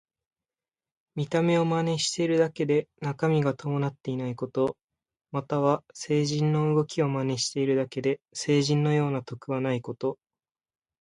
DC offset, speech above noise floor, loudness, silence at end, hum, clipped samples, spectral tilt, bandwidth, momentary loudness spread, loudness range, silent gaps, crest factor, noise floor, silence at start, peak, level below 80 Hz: under 0.1%; over 64 dB; -27 LUFS; 0.85 s; none; under 0.1%; -6 dB/octave; 11.5 kHz; 9 LU; 3 LU; 4.84-4.88 s; 18 dB; under -90 dBFS; 1.15 s; -10 dBFS; -66 dBFS